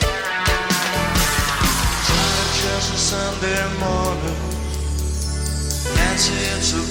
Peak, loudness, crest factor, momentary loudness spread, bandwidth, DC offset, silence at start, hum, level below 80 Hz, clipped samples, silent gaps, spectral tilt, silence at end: -4 dBFS; -19 LUFS; 16 dB; 7 LU; 18.5 kHz; under 0.1%; 0 s; none; -26 dBFS; under 0.1%; none; -3 dB/octave; 0 s